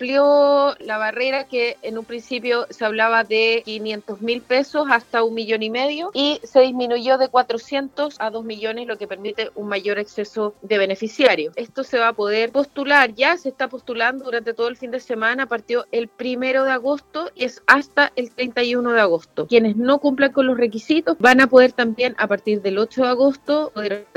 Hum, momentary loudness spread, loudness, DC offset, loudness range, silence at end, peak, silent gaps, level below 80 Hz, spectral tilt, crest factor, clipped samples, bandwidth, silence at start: none; 12 LU; -19 LUFS; under 0.1%; 6 LU; 0.1 s; 0 dBFS; none; -66 dBFS; -4.5 dB/octave; 20 dB; under 0.1%; 12 kHz; 0 s